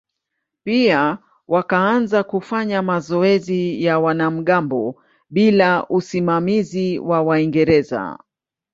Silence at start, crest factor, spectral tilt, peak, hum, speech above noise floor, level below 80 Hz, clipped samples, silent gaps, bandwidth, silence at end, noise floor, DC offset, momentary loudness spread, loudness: 0.65 s; 18 dB; -7 dB/octave; 0 dBFS; none; 61 dB; -56 dBFS; under 0.1%; none; 7.8 kHz; 0.6 s; -78 dBFS; under 0.1%; 8 LU; -18 LUFS